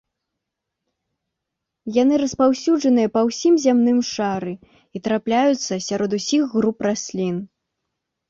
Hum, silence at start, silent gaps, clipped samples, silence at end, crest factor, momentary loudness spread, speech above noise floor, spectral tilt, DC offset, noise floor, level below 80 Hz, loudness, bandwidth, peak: none; 1.85 s; none; under 0.1%; 0.85 s; 16 dB; 11 LU; 62 dB; -5 dB/octave; under 0.1%; -81 dBFS; -60 dBFS; -20 LUFS; 7.8 kHz; -6 dBFS